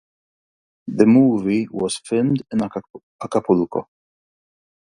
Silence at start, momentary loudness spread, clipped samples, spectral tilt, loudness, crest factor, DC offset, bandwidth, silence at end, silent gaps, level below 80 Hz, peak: 0.85 s; 17 LU; under 0.1%; -6.5 dB/octave; -19 LUFS; 20 dB; under 0.1%; 11.5 kHz; 1.15 s; 2.90-2.94 s, 3.03-3.19 s; -58 dBFS; 0 dBFS